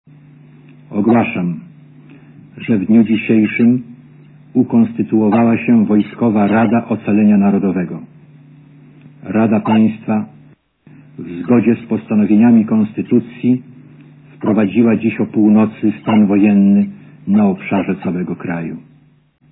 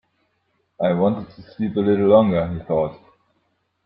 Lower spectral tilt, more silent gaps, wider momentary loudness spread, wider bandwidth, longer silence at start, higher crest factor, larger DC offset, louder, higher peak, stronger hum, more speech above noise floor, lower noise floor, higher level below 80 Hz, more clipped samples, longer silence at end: about the same, -12 dB/octave vs -12 dB/octave; neither; about the same, 12 LU vs 13 LU; second, 3.9 kHz vs 5.4 kHz; about the same, 0.9 s vs 0.8 s; about the same, 14 dB vs 18 dB; neither; first, -14 LUFS vs -20 LUFS; first, 0 dBFS vs -4 dBFS; neither; second, 36 dB vs 50 dB; second, -49 dBFS vs -69 dBFS; second, -60 dBFS vs -54 dBFS; neither; second, 0.75 s vs 0.9 s